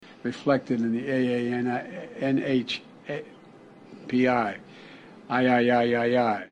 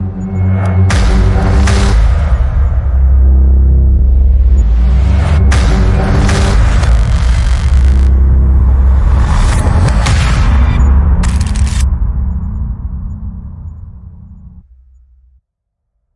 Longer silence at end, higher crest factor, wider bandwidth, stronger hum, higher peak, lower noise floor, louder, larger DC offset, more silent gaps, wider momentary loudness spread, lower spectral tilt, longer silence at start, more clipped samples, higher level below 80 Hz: second, 0.05 s vs 1.55 s; first, 16 dB vs 8 dB; second, 9 kHz vs 11 kHz; neither; second, -10 dBFS vs 0 dBFS; second, -50 dBFS vs -70 dBFS; second, -26 LUFS vs -11 LUFS; neither; neither; first, 16 LU vs 10 LU; about the same, -7 dB/octave vs -6.5 dB/octave; about the same, 0.05 s vs 0 s; neither; second, -66 dBFS vs -10 dBFS